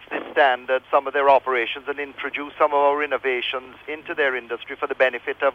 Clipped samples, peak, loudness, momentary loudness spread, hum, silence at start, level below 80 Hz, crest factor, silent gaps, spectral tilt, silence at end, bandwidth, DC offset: under 0.1%; -4 dBFS; -22 LUFS; 12 LU; 50 Hz at -60 dBFS; 0 s; -66 dBFS; 18 dB; none; -4.5 dB/octave; 0 s; 6.4 kHz; under 0.1%